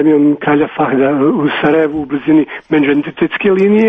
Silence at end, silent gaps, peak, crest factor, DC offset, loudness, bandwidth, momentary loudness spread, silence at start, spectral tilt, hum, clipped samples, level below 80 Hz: 0 s; none; 0 dBFS; 12 dB; under 0.1%; -12 LUFS; 3.8 kHz; 4 LU; 0 s; -9 dB/octave; none; under 0.1%; -50 dBFS